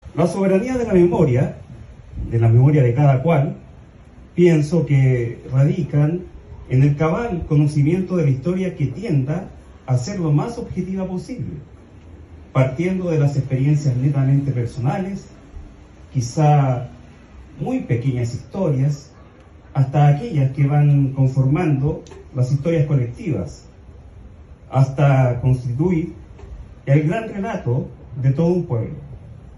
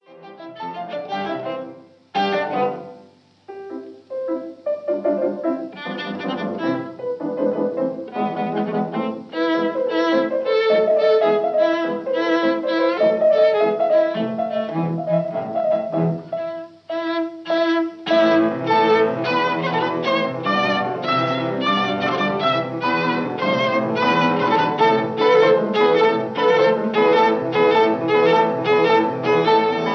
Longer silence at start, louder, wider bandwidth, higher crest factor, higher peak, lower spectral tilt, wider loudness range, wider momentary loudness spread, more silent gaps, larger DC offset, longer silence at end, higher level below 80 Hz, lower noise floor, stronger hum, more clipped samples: about the same, 0.05 s vs 0.1 s; about the same, -19 LUFS vs -19 LUFS; first, 11 kHz vs 6.6 kHz; about the same, 16 dB vs 14 dB; about the same, -2 dBFS vs -4 dBFS; first, -8.5 dB/octave vs -6.5 dB/octave; second, 6 LU vs 9 LU; first, 15 LU vs 12 LU; neither; neither; about the same, 0 s vs 0 s; first, -42 dBFS vs -74 dBFS; second, -44 dBFS vs -50 dBFS; neither; neither